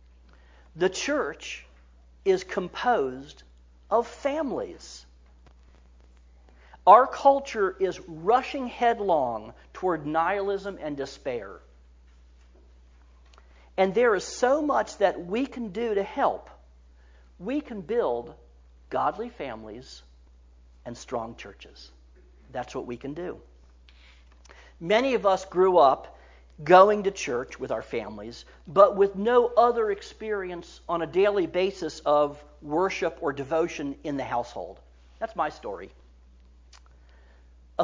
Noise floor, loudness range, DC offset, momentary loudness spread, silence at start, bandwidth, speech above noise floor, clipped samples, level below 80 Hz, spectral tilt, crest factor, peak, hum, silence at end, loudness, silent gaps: -54 dBFS; 15 LU; under 0.1%; 20 LU; 0.75 s; 7.6 kHz; 29 dB; under 0.1%; -54 dBFS; -5 dB/octave; 24 dB; -2 dBFS; none; 0 s; -25 LUFS; none